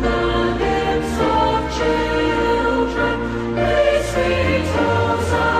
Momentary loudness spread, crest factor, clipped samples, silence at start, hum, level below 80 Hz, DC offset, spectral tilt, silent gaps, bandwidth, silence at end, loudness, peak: 3 LU; 12 dB; under 0.1%; 0 s; none; -30 dBFS; under 0.1%; -6 dB/octave; none; 13.5 kHz; 0 s; -18 LUFS; -6 dBFS